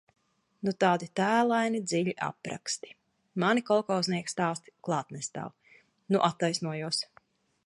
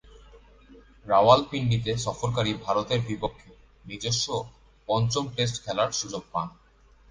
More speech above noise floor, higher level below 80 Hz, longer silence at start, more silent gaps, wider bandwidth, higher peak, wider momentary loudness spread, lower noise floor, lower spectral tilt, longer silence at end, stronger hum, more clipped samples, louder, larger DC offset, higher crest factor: first, 35 dB vs 31 dB; second, -76 dBFS vs -52 dBFS; first, 0.65 s vs 0.15 s; neither; first, 11.5 kHz vs 10 kHz; second, -10 dBFS vs -4 dBFS; about the same, 12 LU vs 13 LU; first, -64 dBFS vs -57 dBFS; about the same, -4.5 dB/octave vs -4.5 dB/octave; about the same, 0.6 s vs 0.6 s; neither; neither; second, -30 LUFS vs -26 LUFS; neither; about the same, 20 dB vs 22 dB